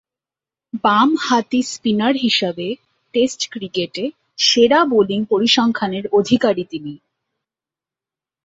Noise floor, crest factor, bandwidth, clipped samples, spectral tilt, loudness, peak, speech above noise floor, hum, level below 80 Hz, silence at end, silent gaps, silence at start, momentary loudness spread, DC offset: -89 dBFS; 18 dB; 8 kHz; under 0.1%; -4 dB/octave; -17 LUFS; -2 dBFS; 73 dB; none; -60 dBFS; 1.5 s; none; 0.75 s; 14 LU; under 0.1%